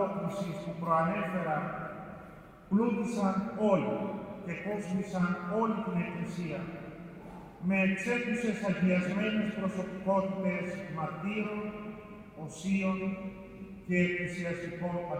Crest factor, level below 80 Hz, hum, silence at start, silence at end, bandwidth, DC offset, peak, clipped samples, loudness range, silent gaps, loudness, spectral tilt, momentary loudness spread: 18 dB; -62 dBFS; none; 0 s; 0 s; 10.5 kHz; under 0.1%; -14 dBFS; under 0.1%; 4 LU; none; -32 LUFS; -7 dB/octave; 16 LU